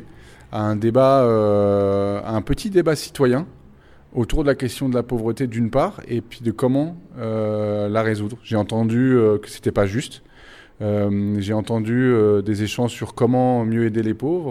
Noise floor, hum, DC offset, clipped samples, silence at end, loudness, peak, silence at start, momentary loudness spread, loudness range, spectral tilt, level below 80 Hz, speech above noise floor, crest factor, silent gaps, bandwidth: -47 dBFS; none; under 0.1%; under 0.1%; 0 s; -20 LUFS; -4 dBFS; 0 s; 10 LU; 4 LU; -7 dB/octave; -40 dBFS; 28 dB; 16 dB; none; 15.5 kHz